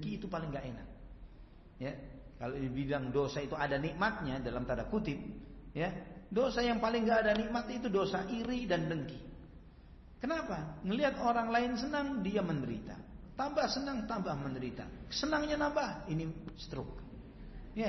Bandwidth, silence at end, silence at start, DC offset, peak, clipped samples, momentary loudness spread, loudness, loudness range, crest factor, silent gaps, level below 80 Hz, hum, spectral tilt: 6.2 kHz; 0 s; 0 s; under 0.1%; -20 dBFS; under 0.1%; 17 LU; -36 LUFS; 4 LU; 16 dB; none; -52 dBFS; none; -4.5 dB/octave